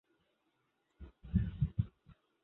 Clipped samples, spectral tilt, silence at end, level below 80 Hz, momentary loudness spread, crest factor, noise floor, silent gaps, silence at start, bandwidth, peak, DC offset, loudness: under 0.1%; -10.5 dB/octave; 0.3 s; -48 dBFS; 22 LU; 22 dB; -80 dBFS; none; 1 s; 4 kHz; -20 dBFS; under 0.1%; -38 LUFS